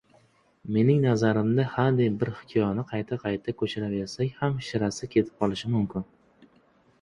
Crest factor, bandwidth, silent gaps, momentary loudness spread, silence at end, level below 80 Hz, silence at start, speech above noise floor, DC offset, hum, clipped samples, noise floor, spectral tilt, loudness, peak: 18 dB; 11 kHz; none; 8 LU; 1 s; -56 dBFS; 0.65 s; 36 dB; under 0.1%; none; under 0.1%; -62 dBFS; -7 dB/octave; -27 LUFS; -8 dBFS